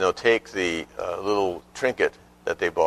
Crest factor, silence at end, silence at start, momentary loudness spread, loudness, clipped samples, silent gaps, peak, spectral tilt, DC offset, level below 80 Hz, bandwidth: 20 dB; 0 s; 0 s; 9 LU; -25 LUFS; under 0.1%; none; -6 dBFS; -4 dB/octave; under 0.1%; -56 dBFS; 13.5 kHz